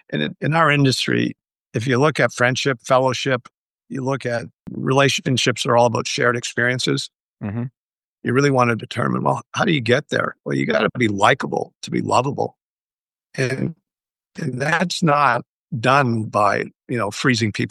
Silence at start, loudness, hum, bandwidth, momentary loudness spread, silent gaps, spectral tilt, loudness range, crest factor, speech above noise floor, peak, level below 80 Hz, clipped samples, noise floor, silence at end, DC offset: 0.1 s; -19 LUFS; none; 12.5 kHz; 11 LU; 1.59-1.71 s, 3.57-3.75 s, 7.15-7.37 s, 7.77-7.98 s, 8.04-8.18 s, 11.75-11.81 s, 12.62-13.06 s, 15.49-15.66 s; -5 dB/octave; 3 LU; 18 dB; over 71 dB; -2 dBFS; -62 dBFS; under 0.1%; under -90 dBFS; 0 s; under 0.1%